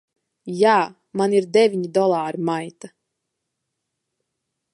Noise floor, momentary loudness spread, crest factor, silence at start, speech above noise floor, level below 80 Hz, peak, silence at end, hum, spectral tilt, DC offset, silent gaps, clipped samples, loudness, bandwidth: -79 dBFS; 13 LU; 20 dB; 0.45 s; 60 dB; -76 dBFS; -2 dBFS; 1.85 s; none; -5.5 dB/octave; under 0.1%; none; under 0.1%; -20 LUFS; 11.5 kHz